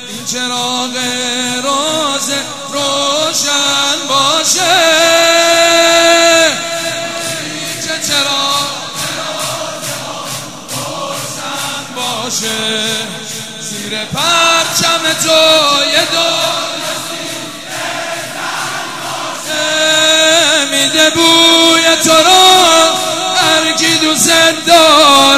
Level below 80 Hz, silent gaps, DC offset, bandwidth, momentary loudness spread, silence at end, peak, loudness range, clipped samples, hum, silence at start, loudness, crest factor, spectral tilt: -54 dBFS; none; 0.8%; 16.5 kHz; 14 LU; 0 s; 0 dBFS; 10 LU; 0.2%; none; 0 s; -10 LUFS; 12 dB; -1 dB/octave